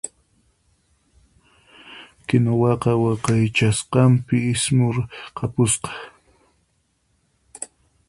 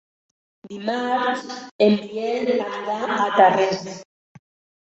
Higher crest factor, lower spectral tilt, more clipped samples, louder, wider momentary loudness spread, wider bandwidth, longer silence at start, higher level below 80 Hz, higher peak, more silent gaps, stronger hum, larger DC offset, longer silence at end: about the same, 20 dB vs 20 dB; about the same, -5.5 dB/octave vs -5 dB/octave; neither; about the same, -20 LUFS vs -21 LUFS; about the same, 19 LU vs 17 LU; first, 11.5 kHz vs 8.2 kHz; second, 0.05 s vs 0.65 s; first, -50 dBFS vs -68 dBFS; about the same, -2 dBFS vs -2 dBFS; second, none vs 1.71-1.79 s; neither; neither; second, 0.45 s vs 0.8 s